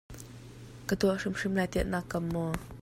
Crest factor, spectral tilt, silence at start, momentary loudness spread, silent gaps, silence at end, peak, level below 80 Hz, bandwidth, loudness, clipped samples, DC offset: 18 dB; -6 dB/octave; 0.1 s; 19 LU; none; 0 s; -14 dBFS; -48 dBFS; 16 kHz; -32 LUFS; under 0.1%; under 0.1%